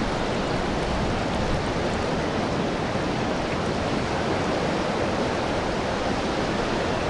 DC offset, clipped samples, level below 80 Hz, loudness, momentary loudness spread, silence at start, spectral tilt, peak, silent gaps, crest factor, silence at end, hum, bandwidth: under 0.1%; under 0.1%; -38 dBFS; -25 LUFS; 1 LU; 0 s; -5.5 dB/octave; -12 dBFS; none; 12 dB; 0 s; none; 11.5 kHz